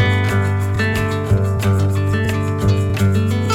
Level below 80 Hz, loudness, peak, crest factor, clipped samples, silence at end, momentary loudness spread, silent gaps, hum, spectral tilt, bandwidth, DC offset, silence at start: -36 dBFS; -17 LUFS; -4 dBFS; 12 dB; under 0.1%; 0 s; 2 LU; none; none; -6.5 dB/octave; 14.5 kHz; under 0.1%; 0 s